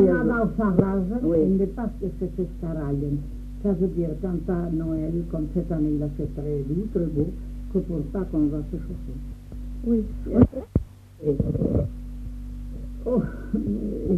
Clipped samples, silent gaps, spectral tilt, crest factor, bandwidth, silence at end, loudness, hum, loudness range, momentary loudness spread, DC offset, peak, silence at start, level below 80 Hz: under 0.1%; none; -10.5 dB/octave; 22 dB; 8.4 kHz; 0 s; -26 LUFS; none; 3 LU; 16 LU; under 0.1%; -2 dBFS; 0 s; -34 dBFS